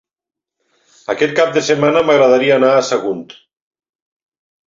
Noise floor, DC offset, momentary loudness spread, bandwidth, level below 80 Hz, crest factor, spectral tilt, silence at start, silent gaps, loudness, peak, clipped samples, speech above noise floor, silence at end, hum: -86 dBFS; under 0.1%; 13 LU; 7.6 kHz; -60 dBFS; 14 dB; -4.5 dB/octave; 1.1 s; none; -13 LUFS; -2 dBFS; under 0.1%; 73 dB; 1.45 s; none